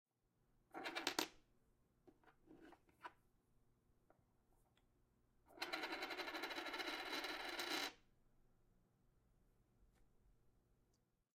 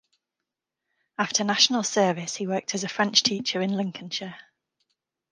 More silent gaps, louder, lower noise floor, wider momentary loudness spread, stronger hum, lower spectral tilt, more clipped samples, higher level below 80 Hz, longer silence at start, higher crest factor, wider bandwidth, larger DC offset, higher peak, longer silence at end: neither; second, -47 LUFS vs -24 LUFS; about the same, -83 dBFS vs -86 dBFS; first, 17 LU vs 13 LU; neither; second, -1 dB/octave vs -2.5 dB/octave; neither; about the same, -80 dBFS vs -76 dBFS; second, 0.75 s vs 1.2 s; first, 32 dB vs 22 dB; first, 16 kHz vs 11 kHz; neither; second, -22 dBFS vs -4 dBFS; about the same, 0.85 s vs 0.9 s